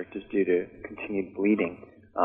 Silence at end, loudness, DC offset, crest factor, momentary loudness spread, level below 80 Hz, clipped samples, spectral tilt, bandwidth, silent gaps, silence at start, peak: 0 s; -28 LUFS; under 0.1%; 18 dB; 14 LU; -62 dBFS; under 0.1%; -10.5 dB/octave; 3.7 kHz; none; 0 s; -10 dBFS